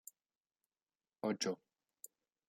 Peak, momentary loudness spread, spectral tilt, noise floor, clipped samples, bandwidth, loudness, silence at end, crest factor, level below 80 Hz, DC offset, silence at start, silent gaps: -24 dBFS; 19 LU; -3.5 dB/octave; under -90 dBFS; under 0.1%; 16 kHz; -41 LUFS; 0.95 s; 24 dB; under -90 dBFS; under 0.1%; 1.25 s; none